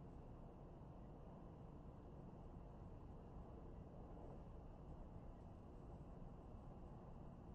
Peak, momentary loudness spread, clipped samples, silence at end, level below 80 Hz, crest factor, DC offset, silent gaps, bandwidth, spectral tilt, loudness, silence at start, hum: -44 dBFS; 1 LU; under 0.1%; 0 s; -62 dBFS; 12 dB; under 0.1%; none; 8 kHz; -9 dB/octave; -60 LUFS; 0 s; none